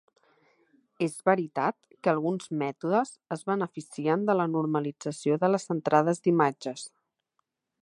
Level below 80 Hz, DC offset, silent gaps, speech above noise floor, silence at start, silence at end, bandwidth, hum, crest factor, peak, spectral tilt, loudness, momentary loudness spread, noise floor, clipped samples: -80 dBFS; under 0.1%; none; 52 dB; 1 s; 0.95 s; 11.5 kHz; none; 22 dB; -6 dBFS; -6.5 dB/octave; -28 LUFS; 10 LU; -79 dBFS; under 0.1%